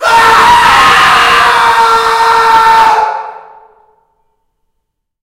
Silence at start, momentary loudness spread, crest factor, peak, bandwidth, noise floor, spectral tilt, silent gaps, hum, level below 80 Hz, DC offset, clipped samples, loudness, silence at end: 0 s; 7 LU; 8 dB; 0 dBFS; 16.5 kHz; -68 dBFS; -1.5 dB/octave; none; none; -38 dBFS; under 0.1%; 2%; -5 LUFS; 1.85 s